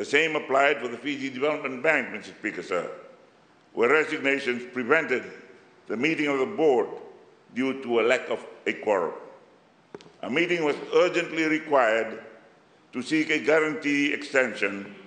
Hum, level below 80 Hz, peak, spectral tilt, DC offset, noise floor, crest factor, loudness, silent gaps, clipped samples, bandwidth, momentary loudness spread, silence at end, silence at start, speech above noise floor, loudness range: none; -82 dBFS; -6 dBFS; -4.5 dB/octave; under 0.1%; -58 dBFS; 22 dB; -25 LUFS; none; under 0.1%; 9.6 kHz; 13 LU; 0.05 s; 0 s; 32 dB; 3 LU